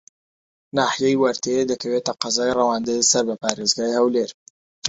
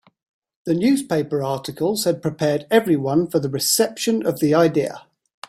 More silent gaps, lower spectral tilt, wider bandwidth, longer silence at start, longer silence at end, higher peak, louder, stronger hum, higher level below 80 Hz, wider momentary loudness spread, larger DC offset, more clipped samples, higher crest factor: first, 4.34-4.82 s vs none; second, -2.5 dB/octave vs -4.5 dB/octave; second, 8 kHz vs 16 kHz; about the same, 0.75 s vs 0.65 s; second, 0 s vs 0.5 s; about the same, -2 dBFS vs -4 dBFS; about the same, -20 LUFS vs -20 LUFS; neither; about the same, -60 dBFS vs -60 dBFS; about the same, 6 LU vs 7 LU; neither; neither; about the same, 20 dB vs 18 dB